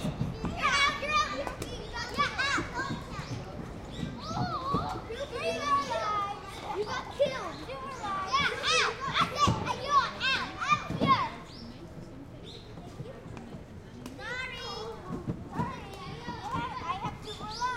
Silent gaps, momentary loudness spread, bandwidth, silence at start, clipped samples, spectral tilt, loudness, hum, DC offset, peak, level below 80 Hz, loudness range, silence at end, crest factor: none; 18 LU; 16 kHz; 0 s; under 0.1%; -4 dB/octave; -31 LUFS; none; under 0.1%; -12 dBFS; -50 dBFS; 11 LU; 0 s; 20 dB